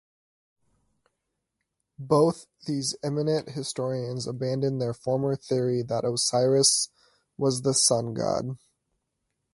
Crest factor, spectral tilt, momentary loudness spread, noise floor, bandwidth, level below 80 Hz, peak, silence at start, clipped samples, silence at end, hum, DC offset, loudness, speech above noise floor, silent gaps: 20 dB; -4.5 dB/octave; 12 LU; -81 dBFS; 11.5 kHz; -64 dBFS; -8 dBFS; 2 s; under 0.1%; 0.95 s; none; under 0.1%; -26 LUFS; 56 dB; none